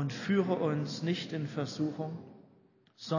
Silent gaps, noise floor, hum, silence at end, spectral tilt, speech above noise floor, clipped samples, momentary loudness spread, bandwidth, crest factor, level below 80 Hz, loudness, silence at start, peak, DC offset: none; -64 dBFS; none; 0 s; -6.5 dB/octave; 32 dB; under 0.1%; 15 LU; 7.4 kHz; 18 dB; -74 dBFS; -33 LUFS; 0 s; -16 dBFS; under 0.1%